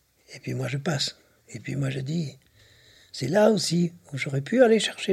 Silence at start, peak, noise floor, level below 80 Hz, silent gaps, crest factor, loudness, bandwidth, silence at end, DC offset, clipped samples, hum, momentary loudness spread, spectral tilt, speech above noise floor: 0.3 s; -6 dBFS; -56 dBFS; -66 dBFS; none; 20 dB; -25 LUFS; 15 kHz; 0 s; under 0.1%; under 0.1%; none; 17 LU; -5 dB/octave; 32 dB